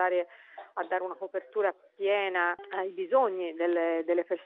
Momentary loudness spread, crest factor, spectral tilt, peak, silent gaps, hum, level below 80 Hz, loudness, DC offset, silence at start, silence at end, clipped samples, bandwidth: 11 LU; 18 dB; -0.5 dB/octave; -12 dBFS; none; none; under -90 dBFS; -30 LUFS; under 0.1%; 0 s; 0 s; under 0.1%; 4 kHz